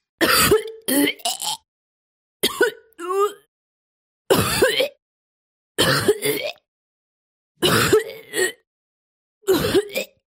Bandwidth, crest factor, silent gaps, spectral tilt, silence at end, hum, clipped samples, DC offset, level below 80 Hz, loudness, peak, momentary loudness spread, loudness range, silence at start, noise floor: 16.5 kHz; 20 dB; 1.68-2.40 s, 3.48-4.25 s, 5.02-5.75 s, 6.68-7.55 s, 8.67-9.41 s; -3 dB/octave; 0.2 s; none; under 0.1%; under 0.1%; -48 dBFS; -20 LUFS; -2 dBFS; 11 LU; 3 LU; 0.2 s; under -90 dBFS